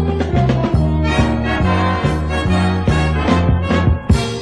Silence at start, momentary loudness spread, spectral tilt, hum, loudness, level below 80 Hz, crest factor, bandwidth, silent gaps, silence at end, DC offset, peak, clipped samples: 0 s; 2 LU; -7 dB/octave; none; -16 LUFS; -22 dBFS; 14 dB; 11.5 kHz; none; 0 s; 0.3%; 0 dBFS; under 0.1%